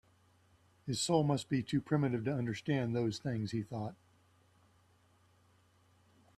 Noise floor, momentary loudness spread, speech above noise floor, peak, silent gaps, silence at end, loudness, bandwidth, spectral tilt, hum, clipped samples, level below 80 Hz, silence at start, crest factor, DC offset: -69 dBFS; 10 LU; 34 dB; -16 dBFS; none; 2.45 s; -35 LUFS; 13.5 kHz; -6 dB/octave; none; under 0.1%; -70 dBFS; 0.85 s; 22 dB; under 0.1%